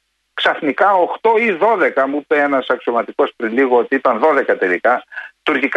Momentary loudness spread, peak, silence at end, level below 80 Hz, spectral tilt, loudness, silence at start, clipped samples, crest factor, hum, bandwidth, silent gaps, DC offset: 6 LU; -2 dBFS; 0 s; -66 dBFS; -5.5 dB/octave; -16 LUFS; 0.35 s; under 0.1%; 14 dB; none; 8.2 kHz; none; under 0.1%